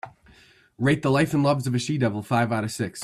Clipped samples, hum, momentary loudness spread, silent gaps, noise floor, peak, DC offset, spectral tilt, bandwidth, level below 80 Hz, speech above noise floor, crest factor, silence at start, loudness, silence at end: under 0.1%; none; 6 LU; none; -55 dBFS; -10 dBFS; under 0.1%; -6 dB/octave; 14 kHz; -58 dBFS; 32 dB; 16 dB; 0.05 s; -24 LUFS; 0 s